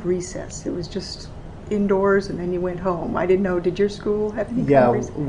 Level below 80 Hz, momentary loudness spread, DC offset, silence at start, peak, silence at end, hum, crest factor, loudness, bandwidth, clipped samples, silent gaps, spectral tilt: -42 dBFS; 13 LU; under 0.1%; 0 s; -2 dBFS; 0 s; none; 20 dB; -22 LUFS; 10.5 kHz; under 0.1%; none; -6.5 dB/octave